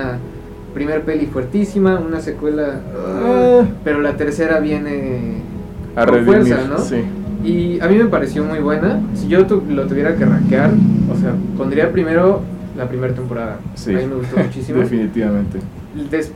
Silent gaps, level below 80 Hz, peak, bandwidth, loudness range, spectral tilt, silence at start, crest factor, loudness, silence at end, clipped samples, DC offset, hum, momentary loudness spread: none; -36 dBFS; -2 dBFS; 12 kHz; 5 LU; -8 dB/octave; 0 s; 14 dB; -16 LUFS; 0 s; under 0.1%; under 0.1%; none; 12 LU